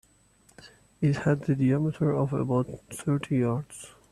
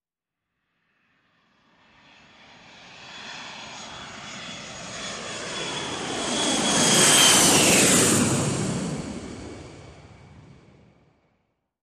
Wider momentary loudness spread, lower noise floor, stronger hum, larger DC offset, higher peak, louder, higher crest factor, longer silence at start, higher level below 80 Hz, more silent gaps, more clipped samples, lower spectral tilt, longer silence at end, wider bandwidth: second, 10 LU vs 23 LU; second, -61 dBFS vs -87 dBFS; neither; neither; second, -12 dBFS vs -6 dBFS; second, -27 LUFS vs -19 LUFS; about the same, 16 dB vs 20 dB; second, 0.65 s vs 2.9 s; about the same, -58 dBFS vs -54 dBFS; neither; neither; first, -7.5 dB/octave vs -2 dB/octave; second, 0.2 s vs 1.7 s; second, 13 kHz vs 15.5 kHz